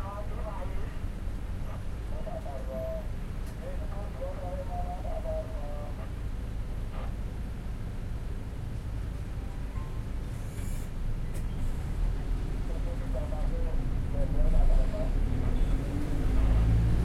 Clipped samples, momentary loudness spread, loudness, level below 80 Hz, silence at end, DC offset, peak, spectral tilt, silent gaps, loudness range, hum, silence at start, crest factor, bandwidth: under 0.1%; 9 LU; -35 LUFS; -30 dBFS; 0 s; under 0.1%; -12 dBFS; -7.5 dB/octave; none; 6 LU; none; 0 s; 16 dB; 12.5 kHz